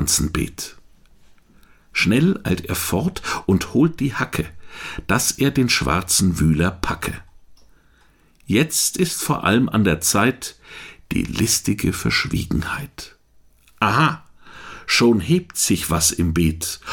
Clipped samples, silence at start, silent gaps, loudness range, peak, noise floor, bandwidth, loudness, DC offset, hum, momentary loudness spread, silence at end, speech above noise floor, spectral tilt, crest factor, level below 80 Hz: under 0.1%; 0 s; none; 3 LU; -4 dBFS; -55 dBFS; 19 kHz; -19 LUFS; under 0.1%; none; 16 LU; 0 s; 35 dB; -4 dB/octave; 18 dB; -38 dBFS